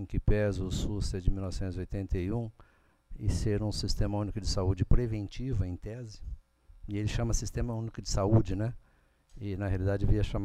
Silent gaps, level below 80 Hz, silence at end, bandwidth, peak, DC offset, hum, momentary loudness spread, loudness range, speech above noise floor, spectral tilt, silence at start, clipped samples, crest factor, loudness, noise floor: none; -36 dBFS; 0 s; 12.5 kHz; -10 dBFS; under 0.1%; none; 13 LU; 2 LU; 34 dB; -6.5 dB/octave; 0 s; under 0.1%; 22 dB; -33 LUFS; -64 dBFS